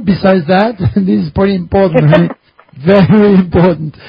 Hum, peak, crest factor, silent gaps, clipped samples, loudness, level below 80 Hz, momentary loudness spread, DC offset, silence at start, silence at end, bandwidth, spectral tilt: none; 0 dBFS; 10 dB; none; 0.3%; -10 LUFS; -32 dBFS; 6 LU; under 0.1%; 0 s; 0 s; 5.2 kHz; -10.5 dB/octave